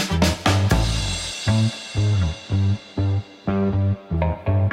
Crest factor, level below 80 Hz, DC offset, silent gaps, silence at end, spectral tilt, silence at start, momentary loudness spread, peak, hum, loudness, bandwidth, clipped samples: 14 dB; -32 dBFS; under 0.1%; none; 0 s; -5.5 dB/octave; 0 s; 5 LU; -6 dBFS; none; -22 LUFS; 14.5 kHz; under 0.1%